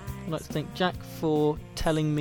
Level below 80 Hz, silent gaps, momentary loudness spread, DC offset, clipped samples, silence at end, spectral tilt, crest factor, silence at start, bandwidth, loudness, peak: -42 dBFS; none; 8 LU; under 0.1%; under 0.1%; 0 s; -6 dB/octave; 16 dB; 0 s; 18.5 kHz; -29 LUFS; -12 dBFS